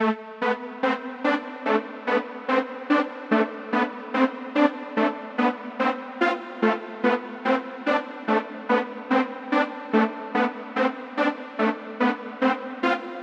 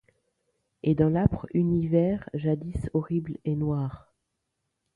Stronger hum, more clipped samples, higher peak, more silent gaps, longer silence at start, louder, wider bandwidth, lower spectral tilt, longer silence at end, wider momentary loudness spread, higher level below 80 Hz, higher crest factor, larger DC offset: neither; neither; about the same, -4 dBFS vs -6 dBFS; neither; second, 0 s vs 0.85 s; about the same, -25 LUFS vs -27 LUFS; first, 8 kHz vs 3.9 kHz; second, -6 dB/octave vs -10.5 dB/octave; second, 0 s vs 1 s; second, 3 LU vs 8 LU; second, -78 dBFS vs -48 dBFS; about the same, 22 dB vs 20 dB; neither